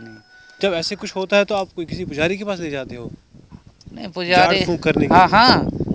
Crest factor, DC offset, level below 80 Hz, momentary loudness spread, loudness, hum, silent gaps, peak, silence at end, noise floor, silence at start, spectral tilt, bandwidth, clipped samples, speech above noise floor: 18 dB; under 0.1%; -42 dBFS; 18 LU; -17 LUFS; none; none; 0 dBFS; 0 s; -45 dBFS; 0 s; -5 dB/octave; 8 kHz; under 0.1%; 27 dB